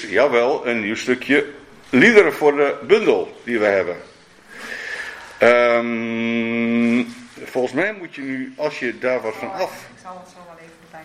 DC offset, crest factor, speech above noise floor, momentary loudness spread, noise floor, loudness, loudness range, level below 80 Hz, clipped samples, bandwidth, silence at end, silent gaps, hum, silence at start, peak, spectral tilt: under 0.1%; 20 dB; 25 dB; 18 LU; -43 dBFS; -18 LUFS; 8 LU; -62 dBFS; under 0.1%; 15 kHz; 0 s; none; none; 0 s; 0 dBFS; -5 dB/octave